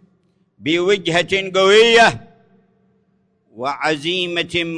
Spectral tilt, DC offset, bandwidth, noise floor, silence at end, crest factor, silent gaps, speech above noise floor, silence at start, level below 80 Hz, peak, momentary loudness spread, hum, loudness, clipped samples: -3.5 dB/octave; under 0.1%; 10.5 kHz; -62 dBFS; 0 s; 16 dB; none; 46 dB; 0.6 s; -54 dBFS; -2 dBFS; 15 LU; none; -15 LUFS; under 0.1%